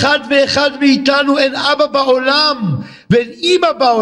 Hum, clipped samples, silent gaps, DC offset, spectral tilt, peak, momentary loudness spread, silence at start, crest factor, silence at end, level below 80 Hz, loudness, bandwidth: none; under 0.1%; none; under 0.1%; -4.5 dB/octave; 0 dBFS; 4 LU; 0 s; 12 dB; 0 s; -52 dBFS; -12 LUFS; 11 kHz